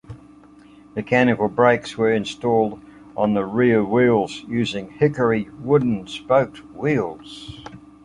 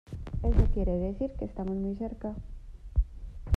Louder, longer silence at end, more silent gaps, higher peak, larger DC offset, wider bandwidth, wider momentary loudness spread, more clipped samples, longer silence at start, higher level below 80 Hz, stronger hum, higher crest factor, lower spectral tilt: first, -20 LUFS vs -32 LUFS; first, 0.25 s vs 0 s; neither; first, -2 dBFS vs -10 dBFS; neither; first, 10.5 kHz vs 4.7 kHz; about the same, 18 LU vs 16 LU; neither; about the same, 0.1 s vs 0.1 s; second, -54 dBFS vs -32 dBFS; neither; about the same, 18 dB vs 20 dB; second, -7 dB/octave vs -10 dB/octave